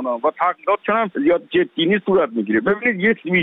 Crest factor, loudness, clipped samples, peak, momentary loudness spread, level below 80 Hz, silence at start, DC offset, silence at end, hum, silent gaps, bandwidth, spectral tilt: 14 dB; -18 LUFS; under 0.1%; -4 dBFS; 3 LU; -58 dBFS; 0 s; under 0.1%; 0 s; none; none; 4 kHz; -9 dB/octave